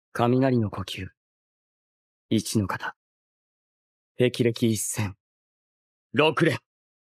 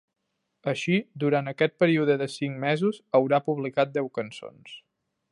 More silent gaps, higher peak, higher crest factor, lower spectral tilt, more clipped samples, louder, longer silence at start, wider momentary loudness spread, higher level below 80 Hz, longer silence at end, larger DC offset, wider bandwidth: first, 1.17-2.29 s, 2.96-4.15 s, 5.20-6.10 s vs none; about the same, -6 dBFS vs -8 dBFS; about the same, 22 dB vs 18 dB; second, -5 dB/octave vs -6.5 dB/octave; neither; about the same, -25 LUFS vs -26 LUFS; second, 0.15 s vs 0.65 s; second, 13 LU vs 18 LU; first, -62 dBFS vs -76 dBFS; about the same, 0.6 s vs 0.55 s; neither; first, 15.5 kHz vs 11.5 kHz